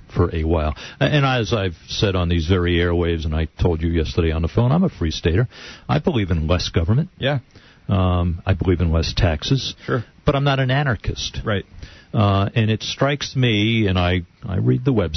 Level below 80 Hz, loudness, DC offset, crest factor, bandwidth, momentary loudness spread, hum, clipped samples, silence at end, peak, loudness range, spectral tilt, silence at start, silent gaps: -32 dBFS; -20 LUFS; under 0.1%; 16 dB; 6.4 kHz; 7 LU; none; under 0.1%; 0 s; -4 dBFS; 1 LU; -6.5 dB/octave; 0.1 s; none